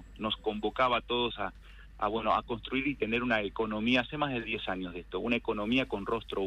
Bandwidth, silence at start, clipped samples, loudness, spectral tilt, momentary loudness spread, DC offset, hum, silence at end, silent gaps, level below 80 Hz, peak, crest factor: 9.4 kHz; 0 s; under 0.1%; -32 LUFS; -6 dB/octave; 7 LU; under 0.1%; none; 0 s; none; -52 dBFS; -14 dBFS; 18 dB